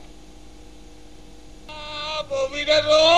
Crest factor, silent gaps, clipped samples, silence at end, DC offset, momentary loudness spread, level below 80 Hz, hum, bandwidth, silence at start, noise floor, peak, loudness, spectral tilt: 18 dB; none; under 0.1%; 0 s; 0.6%; 19 LU; -46 dBFS; none; 10.5 kHz; 0.05 s; -45 dBFS; -4 dBFS; -21 LUFS; -2.5 dB/octave